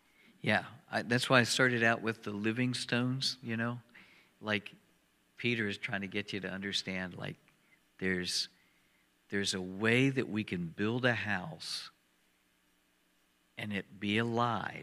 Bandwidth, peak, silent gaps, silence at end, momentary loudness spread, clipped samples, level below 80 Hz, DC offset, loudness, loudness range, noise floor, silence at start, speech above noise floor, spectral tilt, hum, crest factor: 15 kHz; -8 dBFS; none; 0 s; 12 LU; under 0.1%; -76 dBFS; under 0.1%; -33 LUFS; 7 LU; -72 dBFS; 0.45 s; 39 dB; -4.5 dB/octave; none; 26 dB